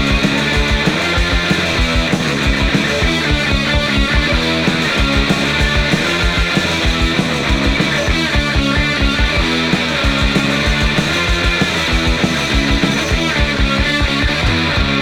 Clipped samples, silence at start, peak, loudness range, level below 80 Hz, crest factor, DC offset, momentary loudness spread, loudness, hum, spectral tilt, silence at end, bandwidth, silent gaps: under 0.1%; 0 s; 0 dBFS; 0 LU; -20 dBFS; 14 dB; under 0.1%; 1 LU; -14 LUFS; none; -4.5 dB/octave; 0 s; 15.5 kHz; none